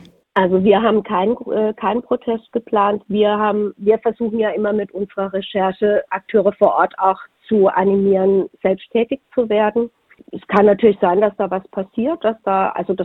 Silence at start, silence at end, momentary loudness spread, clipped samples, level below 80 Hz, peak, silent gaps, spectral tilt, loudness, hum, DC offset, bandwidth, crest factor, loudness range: 0.35 s; 0 s; 8 LU; under 0.1%; -56 dBFS; 0 dBFS; none; -9 dB/octave; -17 LUFS; none; under 0.1%; 4.1 kHz; 18 dB; 2 LU